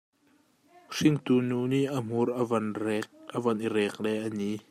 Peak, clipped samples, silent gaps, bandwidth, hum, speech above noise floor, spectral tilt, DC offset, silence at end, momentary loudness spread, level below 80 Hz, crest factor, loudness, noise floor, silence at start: -10 dBFS; under 0.1%; none; 15 kHz; none; 38 dB; -6.5 dB/octave; under 0.1%; 0.1 s; 7 LU; -72 dBFS; 18 dB; -29 LUFS; -66 dBFS; 0.9 s